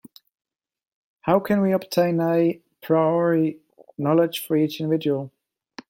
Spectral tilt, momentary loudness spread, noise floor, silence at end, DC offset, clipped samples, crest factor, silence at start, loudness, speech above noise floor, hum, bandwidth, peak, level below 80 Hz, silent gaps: -7 dB/octave; 9 LU; under -90 dBFS; 0.6 s; under 0.1%; under 0.1%; 18 dB; 1.25 s; -22 LUFS; over 69 dB; none; 16.5 kHz; -4 dBFS; -66 dBFS; none